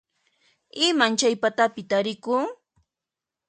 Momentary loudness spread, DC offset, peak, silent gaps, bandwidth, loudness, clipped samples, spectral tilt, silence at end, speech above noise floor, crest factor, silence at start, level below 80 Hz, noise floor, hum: 6 LU; under 0.1%; -4 dBFS; none; 9.6 kHz; -23 LUFS; under 0.1%; -2.5 dB/octave; 0.95 s; 65 dB; 22 dB; 0.75 s; -76 dBFS; -88 dBFS; none